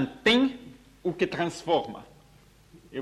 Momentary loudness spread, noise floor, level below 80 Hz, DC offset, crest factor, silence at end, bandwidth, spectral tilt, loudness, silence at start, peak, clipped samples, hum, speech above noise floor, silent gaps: 19 LU; -57 dBFS; -60 dBFS; under 0.1%; 18 dB; 0 s; 13 kHz; -5 dB/octave; -26 LUFS; 0 s; -10 dBFS; under 0.1%; none; 30 dB; none